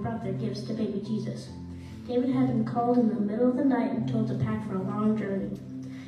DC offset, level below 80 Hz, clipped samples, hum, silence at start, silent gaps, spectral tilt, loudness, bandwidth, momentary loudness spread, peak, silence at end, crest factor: under 0.1%; -58 dBFS; under 0.1%; none; 0 s; none; -8.5 dB/octave; -28 LUFS; 9.8 kHz; 14 LU; -14 dBFS; 0 s; 14 dB